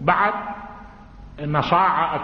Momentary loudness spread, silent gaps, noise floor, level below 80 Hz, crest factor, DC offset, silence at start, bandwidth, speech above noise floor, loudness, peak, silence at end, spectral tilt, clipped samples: 20 LU; none; -42 dBFS; -46 dBFS; 18 dB; under 0.1%; 0 s; 6.4 kHz; 22 dB; -20 LUFS; -4 dBFS; 0 s; -7.5 dB/octave; under 0.1%